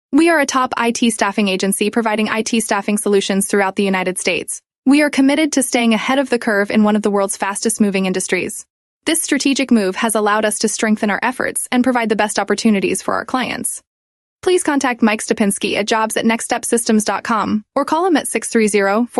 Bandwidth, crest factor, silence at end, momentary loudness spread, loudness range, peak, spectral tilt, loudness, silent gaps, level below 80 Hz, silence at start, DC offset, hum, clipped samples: 13.5 kHz; 14 dB; 0 s; 5 LU; 2 LU; -2 dBFS; -3.5 dB/octave; -16 LUFS; 4.78-4.83 s, 8.70-9.01 s, 13.87-14.39 s; -58 dBFS; 0.1 s; under 0.1%; none; under 0.1%